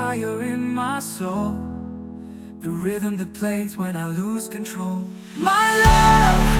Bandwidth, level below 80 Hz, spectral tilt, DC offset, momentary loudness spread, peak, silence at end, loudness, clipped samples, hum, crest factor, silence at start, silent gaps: 18 kHz; -28 dBFS; -5 dB/octave; under 0.1%; 19 LU; -2 dBFS; 0 s; -21 LUFS; under 0.1%; none; 18 dB; 0 s; none